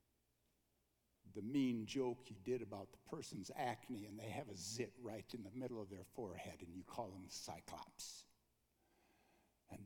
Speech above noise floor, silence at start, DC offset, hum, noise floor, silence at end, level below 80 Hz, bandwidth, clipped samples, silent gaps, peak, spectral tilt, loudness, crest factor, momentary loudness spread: 36 dB; 1.25 s; under 0.1%; none; -83 dBFS; 0 s; -80 dBFS; 19 kHz; under 0.1%; none; -30 dBFS; -5 dB/octave; -48 LUFS; 18 dB; 12 LU